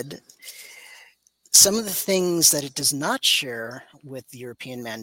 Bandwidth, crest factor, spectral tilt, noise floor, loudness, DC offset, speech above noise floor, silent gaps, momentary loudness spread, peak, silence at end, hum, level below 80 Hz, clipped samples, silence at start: 17 kHz; 24 dB; -1.5 dB/octave; -57 dBFS; -18 LUFS; under 0.1%; 33 dB; none; 26 LU; 0 dBFS; 0 s; none; -64 dBFS; under 0.1%; 0 s